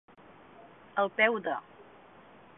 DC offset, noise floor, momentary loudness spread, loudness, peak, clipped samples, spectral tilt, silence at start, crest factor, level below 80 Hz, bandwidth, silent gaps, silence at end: under 0.1%; -55 dBFS; 11 LU; -29 LUFS; -10 dBFS; under 0.1%; -7.5 dB/octave; 0.6 s; 24 dB; -74 dBFS; 4 kHz; none; 0.75 s